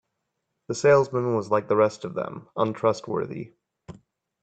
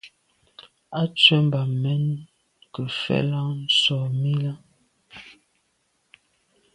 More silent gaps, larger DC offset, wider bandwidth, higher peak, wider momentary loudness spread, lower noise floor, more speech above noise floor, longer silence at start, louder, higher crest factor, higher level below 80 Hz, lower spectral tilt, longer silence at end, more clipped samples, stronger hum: neither; neither; second, 8.8 kHz vs 10.5 kHz; second, -6 dBFS vs 0 dBFS; second, 15 LU vs 24 LU; first, -79 dBFS vs -70 dBFS; first, 56 dB vs 48 dB; first, 0.7 s vs 0.05 s; about the same, -24 LUFS vs -22 LUFS; about the same, 20 dB vs 24 dB; about the same, -66 dBFS vs -64 dBFS; about the same, -6 dB/octave vs -5.5 dB/octave; second, 0.5 s vs 1.45 s; neither; neither